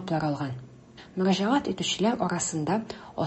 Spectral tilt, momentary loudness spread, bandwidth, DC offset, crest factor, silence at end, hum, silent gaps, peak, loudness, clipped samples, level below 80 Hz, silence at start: -4.5 dB/octave; 12 LU; 8.6 kHz; under 0.1%; 16 dB; 0 s; none; none; -12 dBFS; -27 LUFS; under 0.1%; -60 dBFS; 0 s